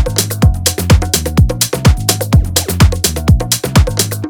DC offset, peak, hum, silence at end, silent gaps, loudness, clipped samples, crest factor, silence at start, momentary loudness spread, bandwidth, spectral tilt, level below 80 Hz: under 0.1%; 0 dBFS; none; 0 s; none; -12 LUFS; under 0.1%; 12 dB; 0 s; 3 LU; over 20 kHz; -4.5 dB/octave; -18 dBFS